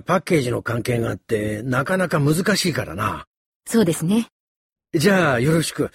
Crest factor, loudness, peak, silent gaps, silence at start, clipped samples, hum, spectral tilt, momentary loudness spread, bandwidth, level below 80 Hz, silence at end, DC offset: 16 dB; -20 LUFS; -4 dBFS; 3.27-3.60 s, 4.32-4.76 s; 0.1 s; under 0.1%; none; -5.5 dB/octave; 8 LU; 16.5 kHz; -50 dBFS; 0.05 s; under 0.1%